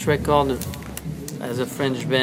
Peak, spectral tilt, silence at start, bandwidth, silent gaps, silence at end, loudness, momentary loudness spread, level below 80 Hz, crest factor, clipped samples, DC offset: -4 dBFS; -5 dB/octave; 0 s; 16 kHz; none; 0 s; -24 LUFS; 13 LU; -42 dBFS; 18 dB; under 0.1%; under 0.1%